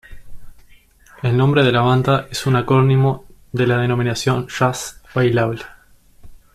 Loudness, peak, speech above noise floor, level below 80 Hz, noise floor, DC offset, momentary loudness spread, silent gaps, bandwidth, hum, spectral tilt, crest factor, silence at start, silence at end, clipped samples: -17 LUFS; -4 dBFS; 32 dB; -44 dBFS; -48 dBFS; under 0.1%; 12 LU; none; 14 kHz; none; -6.5 dB/octave; 14 dB; 0.1 s; 0.15 s; under 0.1%